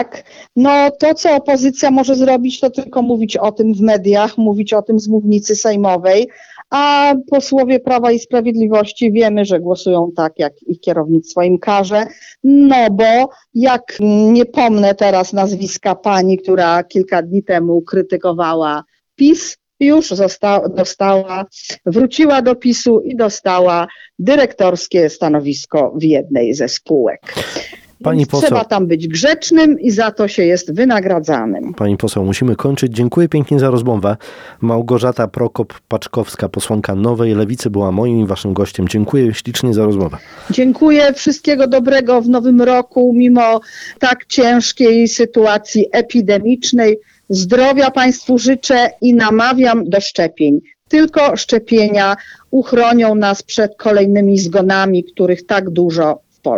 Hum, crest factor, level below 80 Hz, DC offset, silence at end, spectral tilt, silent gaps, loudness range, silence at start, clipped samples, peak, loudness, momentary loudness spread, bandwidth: none; 12 dB; -50 dBFS; under 0.1%; 0 s; -5.5 dB/octave; none; 4 LU; 0 s; under 0.1%; -2 dBFS; -13 LUFS; 7 LU; 14.5 kHz